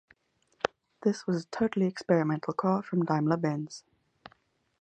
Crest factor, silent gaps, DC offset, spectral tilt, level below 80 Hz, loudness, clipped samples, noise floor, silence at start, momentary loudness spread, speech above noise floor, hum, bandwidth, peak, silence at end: 22 dB; none; under 0.1%; -7 dB/octave; -70 dBFS; -30 LUFS; under 0.1%; -68 dBFS; 0.65 s; 8 LU; 40 dB; none; 9.2 kHz; -8 dBFS; 1.05 s